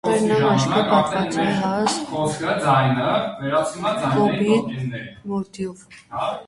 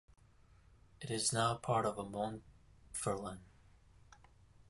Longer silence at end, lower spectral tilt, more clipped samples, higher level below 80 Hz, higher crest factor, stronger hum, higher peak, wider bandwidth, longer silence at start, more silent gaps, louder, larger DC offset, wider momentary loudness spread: second, 0.05 s vs 0.55 s; first, -5.5 dB/octave vs -4 dB/octave; neither; first, -54 dBFS vs -64 dBFS; second, 16 dB vs 22 dB; neither; first, -4 dBFS vs -20 dBFS; about the same, 11.5 kHz vs 12 kHz; second, 0.05 s vs 1 s; neither; first, -21 LUFS vs -38 LUFS; neither; second, 11 LU vs 17 LU